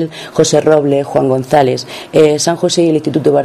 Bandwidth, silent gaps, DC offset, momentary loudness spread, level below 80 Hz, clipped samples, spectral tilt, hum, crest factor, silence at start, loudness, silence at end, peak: 13.5 kHz; none; under 0.1%; 5 LU; -50 dBFS; 0.5%; -5 dB/octave; none; 12 dB; 0 s; -12 LUFS; 0 s; 0 dBFS